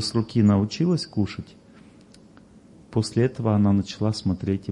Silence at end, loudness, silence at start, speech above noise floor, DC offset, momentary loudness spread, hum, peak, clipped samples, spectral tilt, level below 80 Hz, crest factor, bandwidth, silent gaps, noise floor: 0 s; -23 LUFS; 0 s; 28 dB; under 0.1%; 9 LU; none; -8 dBFS; under 0.1%; -7 dB/octave; -56 dBFS; 16 dB; 11 kHz; none; -50 dBFS